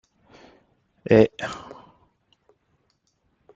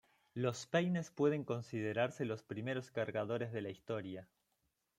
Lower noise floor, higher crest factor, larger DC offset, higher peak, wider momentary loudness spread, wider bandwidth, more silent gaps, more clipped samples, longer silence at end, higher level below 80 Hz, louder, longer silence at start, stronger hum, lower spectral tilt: second, -70 dBFS vs -83 dBFS; about the same, 24 dB vs 20 dB; neither; first, -2 dBFS vs -20 dBFS; first, 24 LU vs 8 LU; second, 7.8 kHz vs 16 kHz; neither; neither; first, 2 s vs 0.75 s; first, -58 dBFS vs -80 dBFS; first, -21 LUFS vs -39 LUFS; first, 1.1 s vs 0.35 s; neither; about the same, -7 dB/octave vs -6 dB/octave